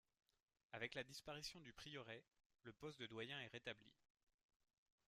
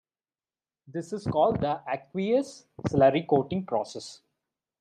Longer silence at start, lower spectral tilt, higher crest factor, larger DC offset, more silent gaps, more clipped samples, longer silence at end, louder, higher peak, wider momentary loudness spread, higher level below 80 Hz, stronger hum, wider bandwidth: second, 0.7 s vs 0.9 s; second, -3.5 dB/octave vs -7 dB/octave; about the same, 24 dB vs 20 dB; neither; first, 2.46-2.50 s vs none; neither; first, 1.2 s vs 0.65 s; second, -55 LUFS vs -27 LUFS; second, -34 dBFS vs -8 dBFS; second, 10 LU vs 16 LU; second, -82 dBFS vs -58 dBFS; neither; first, 13.5 kHz vs 10.5 kHz